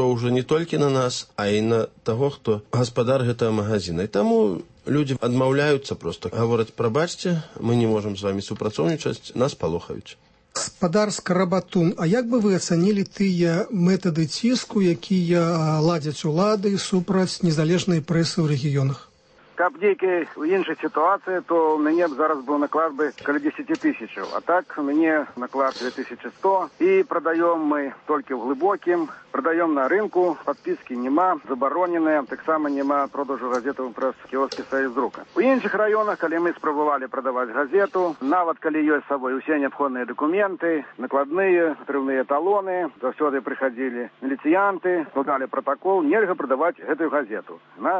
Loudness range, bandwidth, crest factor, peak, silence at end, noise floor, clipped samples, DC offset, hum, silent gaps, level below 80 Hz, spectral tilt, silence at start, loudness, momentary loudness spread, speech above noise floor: 3 LU; 8.8 kHz; 14 dB; -8 dBFS; 0 s; -54 dBFS; under 0.1%; under 0.1%; none; none; -60 dBFS; -6 dB/octave; 0 s; -23 LUFS; 7 LU; 32 dB